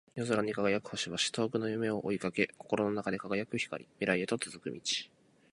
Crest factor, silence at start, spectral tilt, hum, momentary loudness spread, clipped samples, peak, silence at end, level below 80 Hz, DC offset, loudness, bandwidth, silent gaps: 22 dB; 0.15 s; -4 dB/octave; none; 5 LU; under 0.1%; -12 dBFS; 0.45 s; -70 dBFS; under 0.1%; -34 LUFS; 11.5 kHz; none